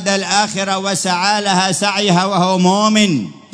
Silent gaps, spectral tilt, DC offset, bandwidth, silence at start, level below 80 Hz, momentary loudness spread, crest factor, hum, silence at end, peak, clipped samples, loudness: none; -3.5 dB/octave; under 0.1%; 11 kHz; 0 s; -62 dBFS; 5 LU; 14 dB; none; 0.15 s; 0 dBFS; under 0.1%; -14 LUFS